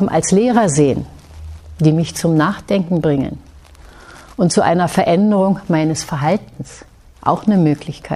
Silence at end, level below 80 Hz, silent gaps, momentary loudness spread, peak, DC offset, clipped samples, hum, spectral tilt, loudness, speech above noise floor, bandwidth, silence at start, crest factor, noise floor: 0 s; -42 dBFS; none; 20 LU; 0 dBFS; under 0.1%; under 0.1%; none; -6 dB/octave; -16 LUFS; 26 dB; 13.5 kHz; 0 s; 16 dB; -40 dBFS